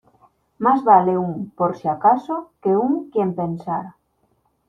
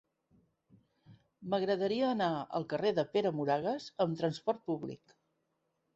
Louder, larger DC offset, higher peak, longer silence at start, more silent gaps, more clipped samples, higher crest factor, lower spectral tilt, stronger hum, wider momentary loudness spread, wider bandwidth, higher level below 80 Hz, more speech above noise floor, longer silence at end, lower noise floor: first, -20 LUFS vs -34 LUFS; neither; first, -2 dBFS vs -18 dBFS; second, 0.6 s vs 1.1 s; neither; neither; about the same, 20 dB vs 18 dB; first, -10 dB/octave vs -7 dB/octave; neither; first, 13 LU vs 8 LU; second, 6.4 kHz vs 8 kHz; first, -62 dBFS vs -76 dBFS; about the same, 46 dB vs 48 dB; second, 0.8 s vs 1 s; second, -65 dBFS vs -81 dBFS